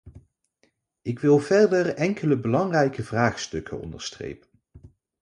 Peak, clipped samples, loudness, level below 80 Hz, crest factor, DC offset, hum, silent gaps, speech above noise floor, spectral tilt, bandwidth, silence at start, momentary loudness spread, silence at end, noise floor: -4 dBFS; under 0.1%; -23 LUFS; -54 dBFS; 20 dB; under 0.1%; none; none; 46 dB; -6 dB/octave; 10.5 kHz; 0.05 s; 17 LU; 0.35 s; -69 dBFS